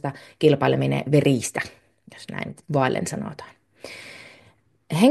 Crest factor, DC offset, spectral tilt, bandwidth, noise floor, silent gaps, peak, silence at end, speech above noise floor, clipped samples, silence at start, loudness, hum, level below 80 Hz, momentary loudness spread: 20 dB; under 0.1%; -6 dB/octave; 12.5 kHz; -58 dBFS; none; -4 dBFS; 0 s; 35 dB; under 0.1%; 0.05 s; -23 LUFS; none; -62 dBFS; 22 LU